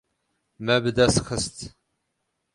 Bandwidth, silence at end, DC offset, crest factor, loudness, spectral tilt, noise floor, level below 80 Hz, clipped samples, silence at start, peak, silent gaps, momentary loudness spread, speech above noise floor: 11.5 kHz; 0.85 s; under 0.1%; 20 dB; -23 LUFS; -4 dB/octave; -77 dBFS; -46 dBFS; under 0.1%; 0.6 s; -6 dBFS; none; 18 LU; 54 dB